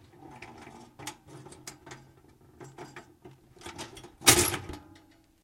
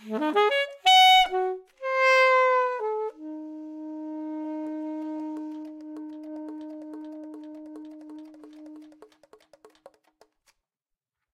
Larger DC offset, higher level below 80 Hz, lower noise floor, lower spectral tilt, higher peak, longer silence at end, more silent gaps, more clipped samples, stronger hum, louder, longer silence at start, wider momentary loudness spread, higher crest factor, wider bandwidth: neither; first, -54 dBFS vs -66 dBFS; second, -59 dBFS vs -88 dBFS; about the same, -1.5 dB/octave vs -1 dB/octave; first, -2 dBFS vs -8 dBFS; second, 0.65 s vs 2.3 s; neither; neither; neither; about the same, -23 LUFS vs -23 LUFS; first, 0.25 s vs 0 s; first, 29 LU vs 24 LU; first, 32 dB vs 20 dB; about the same, 16 kHz vs 16 kHz